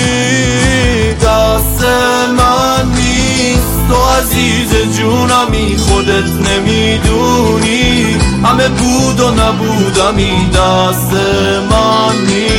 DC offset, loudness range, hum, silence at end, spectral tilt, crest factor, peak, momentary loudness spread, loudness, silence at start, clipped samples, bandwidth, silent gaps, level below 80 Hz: under 0.1%; 1 LU; none; 0 s; -4.5 dB/octave; 10 dB; 0 dBFS; 2 LU; -10 LUFS; 0 s; under 0.1%; 17 kHz; none; -20 dBFS